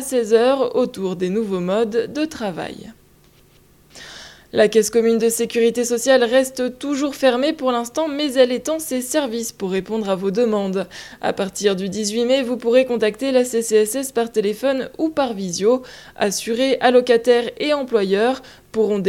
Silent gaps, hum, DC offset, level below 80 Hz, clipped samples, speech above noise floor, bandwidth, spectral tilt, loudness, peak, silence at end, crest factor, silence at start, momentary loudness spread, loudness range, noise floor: none; none; under 0.1%; -56 dBFS; under 0.1%; 33 dB; 16.5 kHz; -4 dB/octave; -19 LUFS; -2 dBFS; 0 s; 18 dB; 0 s; 9 LU; 4 LU; -52 dBFS